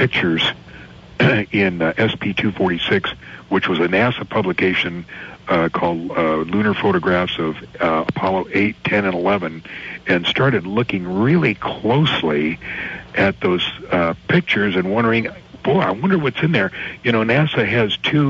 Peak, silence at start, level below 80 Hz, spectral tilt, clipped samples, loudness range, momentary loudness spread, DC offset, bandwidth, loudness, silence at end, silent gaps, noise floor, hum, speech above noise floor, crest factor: -2 dBFS; 0 s; -48 dBFS; -7 dB/octave; under 0.1%; 1 LU; 8 LU; under 0.1%; 7.6 kHz; -18 LUFS; 0 s; none; -39 dBFS; none; 21 dB; 16 dB